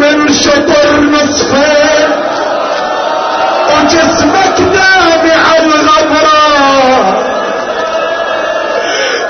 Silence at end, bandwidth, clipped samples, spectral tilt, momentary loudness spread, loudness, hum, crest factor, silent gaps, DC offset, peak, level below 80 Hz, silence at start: 0 s; 6.6 kHz; under 0.1%; -3 dB/octave; 7 LU; -8 LUFS; none; 8 dB; none; under 0.1%; 0 dBFS; -38 dBFS; 0 s